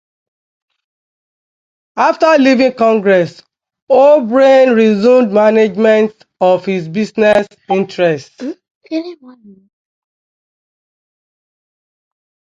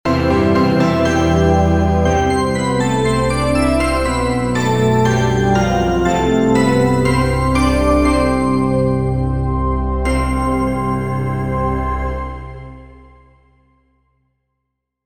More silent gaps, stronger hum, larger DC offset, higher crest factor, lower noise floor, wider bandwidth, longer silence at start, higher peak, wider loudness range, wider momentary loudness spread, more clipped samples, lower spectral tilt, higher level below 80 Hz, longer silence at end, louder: first, 3.82-3.87 s, 8.71-8.81 s vs none; neither; second, under 0.1% vs 1%; about the same, 14 dB vs 14 dB; first, under -90 dBFS vs -75 dBFS; second, 7.8 kHz vs over 20 kHz; first, 1.95 s vs 0.05 s; about the same, 0 dBFS vs -2 dBFS; first, 13 LU vs 8 LU; first, 14 LU vs 6 LU; neither; about the same, -6.5 dB/octave vs -6.5 dB/octave; second, -60 dBFS vs -26 dBFS; first, 3.45 s vs 0 s; first, -11 LUFS vs -16 LUFS